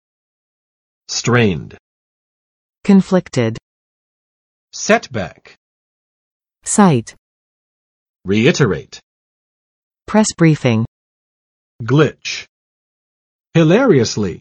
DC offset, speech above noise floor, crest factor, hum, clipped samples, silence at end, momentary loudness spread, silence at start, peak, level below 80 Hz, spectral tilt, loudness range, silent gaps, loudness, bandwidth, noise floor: under 0.1%; over 76 dB; 18 dB; none; under 0.1%; 0.05 s; 15 LU; 1.1 s; 0 dBFS; -50 dBFS; -5.5 dB/octave; 3 LU; 1.80-2.69 s, 3.62-4.68 s, 5.57-6.40 s, 7.18-8.14 s, 9.03-9.91 s, 10.88-11.79 s, 12.49-13.44 s; -15 LUFS; 11.5 kHz; under -90 dBFS